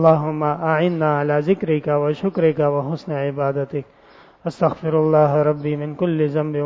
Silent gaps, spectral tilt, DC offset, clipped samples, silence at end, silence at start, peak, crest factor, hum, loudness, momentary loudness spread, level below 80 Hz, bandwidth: none; -9.5 dB/octave; under 0.1%; under 0.1%; 0 s; 0 s; -2 dBFS; 18 dB; none; -20 LUFS; 9 LU; -58 dBFS; 7.4 kHz